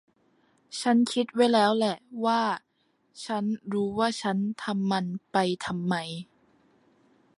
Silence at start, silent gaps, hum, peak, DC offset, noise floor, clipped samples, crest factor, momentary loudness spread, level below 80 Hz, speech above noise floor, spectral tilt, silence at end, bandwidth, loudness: 0.7 s; none; none; -10 dBFS; under 0.1%; -68 dBFS; under 0.1%; 18 dB; 10 LU; -70 dBFS; 42 dB; -5.5 dB/octave; 1.15 s; 11.5 kHz; -27 LUFS